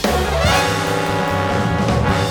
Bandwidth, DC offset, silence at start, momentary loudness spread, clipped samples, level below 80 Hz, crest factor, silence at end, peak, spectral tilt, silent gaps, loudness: 20 kHz; under 0.1%; 0 s; 3 LU; under 0.1%; -28 dBFS; 14 dB; 0 s; -4 dBFS; -5 dB/octave; none; -17 LUFS